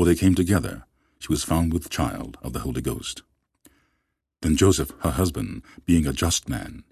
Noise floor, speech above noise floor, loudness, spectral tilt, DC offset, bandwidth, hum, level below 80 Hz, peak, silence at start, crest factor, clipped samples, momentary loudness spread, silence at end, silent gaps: -75 dBFS; 52 dB; -24 LUFS; -5 dB/octave; under 0.1%; 14.5 kHz; none; -34 dBFS; -4 dBFS; 0 s; 20 dB; under 0.1%; 15 LU; 0.1 s; none